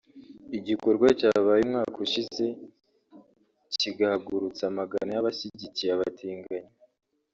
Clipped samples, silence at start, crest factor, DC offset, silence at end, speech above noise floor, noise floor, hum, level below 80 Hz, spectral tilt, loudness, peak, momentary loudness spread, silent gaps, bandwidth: under 0.1%; 0.15 s; 20 dB; under 0.1%; 0.7 s; 29 dB; -56 dBFS; none; -66 dBFS; -3.5 dB/octave; -27 LUFS; -8 dBFS; 15 LU; none; 7.6 kHz